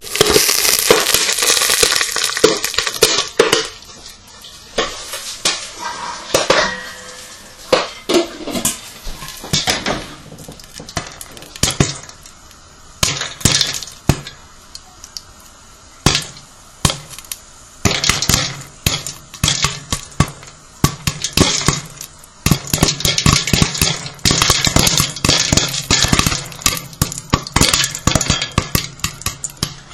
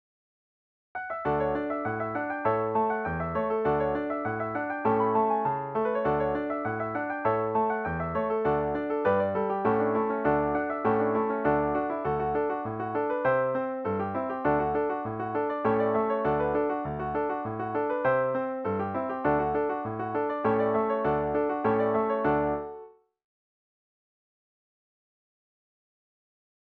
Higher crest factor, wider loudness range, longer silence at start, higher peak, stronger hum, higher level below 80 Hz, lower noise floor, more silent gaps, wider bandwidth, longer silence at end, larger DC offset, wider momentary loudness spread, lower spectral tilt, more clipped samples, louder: about the same, 18 dB vs 16 dB; first, 8 LU vs 2 LU; second, 0 s vs 0.95 s; first, 0 dBFS vs -12 dBFS; neither; first, -32 dBFS vs -54 dBFS; second, -41 dBFS vs -49 dBFS; neither; first, over 20 kHz vs 4.6 kHz; second, 0 s vs 3.9 s; neither; first, 20 LU vs 5 LU; second, -2.5 dB/octave vs -10 dB/octave; first, 0.1% vs under 0.1%; first, -15 LUFS vs -28 LUFS